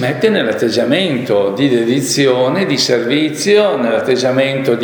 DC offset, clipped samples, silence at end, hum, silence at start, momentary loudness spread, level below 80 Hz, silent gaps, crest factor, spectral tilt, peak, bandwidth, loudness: under 0.1%; under 0.1%; 0 s; none; 0 s; 3 LU; -60 dBFS; none; 14 dB; -4.5 dB/octave; 0 dBFS; over 20 kHz; -13 LUFS